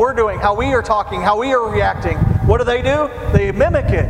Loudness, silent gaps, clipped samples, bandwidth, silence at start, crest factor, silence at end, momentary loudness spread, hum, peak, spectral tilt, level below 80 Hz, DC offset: -16 LUFS; none; under 0.1%; 11 kHz; 0 s; 16 dB; 0 s; 3 LU; none; 0 dBFS; -7 dB/octave; -26 dBFS; under 0.1%